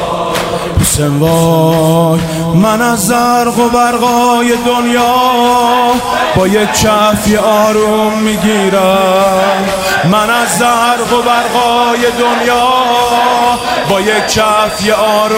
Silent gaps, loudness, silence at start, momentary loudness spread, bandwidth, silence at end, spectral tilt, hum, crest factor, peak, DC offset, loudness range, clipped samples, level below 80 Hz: none; -10 LUFS; 0 s; 3 LU; 16.5 kHz; 0 s; -4 dB/octave; none; 10 dB; 0 dBFS; under 0.1%; 1 LU; under 0.1%; -34 dBFS